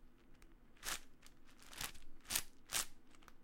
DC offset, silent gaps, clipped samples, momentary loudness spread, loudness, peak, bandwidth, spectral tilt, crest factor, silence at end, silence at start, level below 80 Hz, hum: under 0.1%; none; under 0.1%; 24 LU; -44 LUFS; -16 dBFS; 17 kHz; 0 dB/octave; 32 dB; 0 s; 0 s; -58 dBFS; none